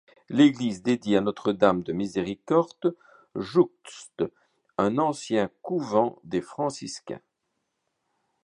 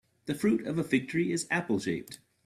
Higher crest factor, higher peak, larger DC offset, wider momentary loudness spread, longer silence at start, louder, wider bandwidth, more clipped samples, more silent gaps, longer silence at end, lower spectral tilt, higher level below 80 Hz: about the same, 22 dB vs 18 dB; first, -4 dBFS vs -12 dBFS; neither; first, 15 LU vs 9 LU; about the same, 0.3 s vs 0.25 s; first, -26 LUFS vs -30 LUFS; second, 10.5 kHz vs 15 kHz; neither; neither; first, 1.25 s vs 0.3 s; about the same, -6 dB/octave vs -5.5 dB/octave; about the same, -64 dBFS vs -66 dBFS